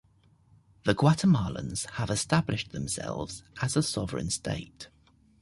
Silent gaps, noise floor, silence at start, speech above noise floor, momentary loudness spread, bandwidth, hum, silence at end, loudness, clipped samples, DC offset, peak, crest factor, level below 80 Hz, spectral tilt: none; -62 dBFS; 0.85 s; 34 dB; 13 LU; 11.5 kHz; none; 0.55 s; -29 LUFS; under 0.1%; under 0.1%; -8 dBFS; 20 dB; -52 dBFS; -5 dB/octave